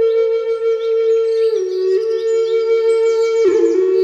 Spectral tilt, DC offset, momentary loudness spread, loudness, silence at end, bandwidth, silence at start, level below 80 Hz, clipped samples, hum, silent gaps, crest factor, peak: -3.5 dB/octave; under 0.1%; 4 LU; -15 LUFS; 0 s; 8.6 kHz; 0 s; -76 dBFS; under 0.1%; none; none; 10 dB; -4 dBFS